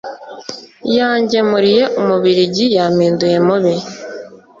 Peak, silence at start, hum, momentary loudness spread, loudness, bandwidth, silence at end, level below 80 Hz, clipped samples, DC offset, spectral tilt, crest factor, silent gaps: -2 dBFS; 0.05 s; none; 17 LU; -13 LUFS; 7.6 kHz; 0.25 s; -56 dBFS; under 0.1%; under 0.1%; -5.5 dB/octave; 12 dB; none